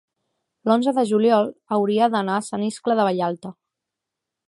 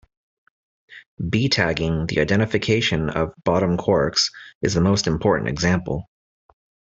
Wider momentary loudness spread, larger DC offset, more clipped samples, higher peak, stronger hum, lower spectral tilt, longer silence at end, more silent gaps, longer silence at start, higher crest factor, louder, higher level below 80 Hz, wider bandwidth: first, 9 LU vs 6 LU; neither; neither; about the same, -4 dBFS vs -4 dBFS; neither; about the same, -6 dB/octave vs -5 dB/octave; about the same, 0.95 s vs 0.95 s; second, none vs 1.06-1.17 s, 4.55-4.61 s; second, 0.65 s vs 0.9 s; about the same, 18 dB vs 18 dB; about the same, -21 LUFS vs -21 LUFS; second, -74 dBFS vs -44 dBFS; first, 11.5 kHz vs 8.2 kHz